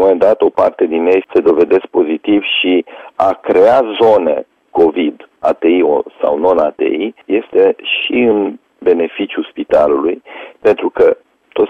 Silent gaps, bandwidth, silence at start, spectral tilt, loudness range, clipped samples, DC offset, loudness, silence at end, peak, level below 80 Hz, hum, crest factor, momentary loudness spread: none; 6 kHz; 0 s; -6.5 dB/octave; 2 LU; under 0.1%; under 0.1%; -13 LUFS; 0 s; 0 dBFS; -52 dBFS; none; 12 dB; 9 LU